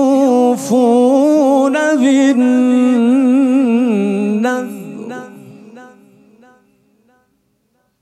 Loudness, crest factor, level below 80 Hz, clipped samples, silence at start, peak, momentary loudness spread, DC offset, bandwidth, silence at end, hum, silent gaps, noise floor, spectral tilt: -12 LUFS; 12 dB; -72 dBFS; under 0.1%; 0 s; -2 dBFS; 15 LU; under 0.1%; 12.5 kHz; 2.15 s; none; none; -62 dBFS; -6 dB/octave